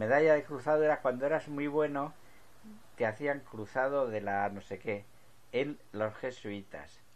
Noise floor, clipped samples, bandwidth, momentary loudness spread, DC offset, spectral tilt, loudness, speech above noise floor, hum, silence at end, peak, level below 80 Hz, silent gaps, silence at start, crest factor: -56 dBFS; under 0.1%; 13.5 kHz; 13 LU; 0.2%; -6.5 dB/octave; -33 LUFS; 23 dB; none; 0.3 s; -14 dBFS; -68 dBFS; none; 0 s; 20 dB